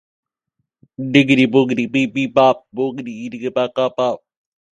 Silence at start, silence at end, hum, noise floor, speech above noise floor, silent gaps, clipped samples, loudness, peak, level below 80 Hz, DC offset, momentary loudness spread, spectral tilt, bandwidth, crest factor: 1 s; 0.6 s; none; -75 dBFS; 58 dB; none; under 0.1%; -17 LUFS; 0 dBFS; -62 dBFS; under 0.1%; 14 LU; -6.5 dB/octave; 8.8 kHz; 18 dB